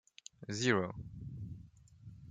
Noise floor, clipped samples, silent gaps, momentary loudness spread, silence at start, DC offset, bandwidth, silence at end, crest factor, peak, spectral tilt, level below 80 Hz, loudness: -57 dBFS; under 0.1%; none; 23 LU; 0.4 s; under 0.1%; 9.6 kHz; 0 s; 26 dB; -14 dBFS; -4.5 dB/octave; -62 dBFS; -37 LUFS